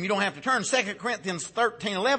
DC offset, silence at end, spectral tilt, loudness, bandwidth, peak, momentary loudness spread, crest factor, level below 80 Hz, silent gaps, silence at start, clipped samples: under 0.1%; 0 s; -3 dB/octave; -27 LUFS; 8.8 kHz; -10 dBFS; 6 LU; 16 dB; -68 dBFS; none; 0 s; under 0.1%